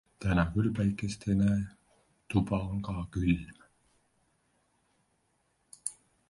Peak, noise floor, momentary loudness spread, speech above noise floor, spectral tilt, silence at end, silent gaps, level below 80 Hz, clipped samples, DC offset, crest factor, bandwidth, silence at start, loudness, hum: -12 dBFS; -74 dBFS; 12 LU; 45 dB; -6.5 dB/octave; 0.35 s; none; -48 dBFS; under 0.1%; under 0.1%; 20 dB; 11.5 kHz; 0.2 s; -31 LUFS; none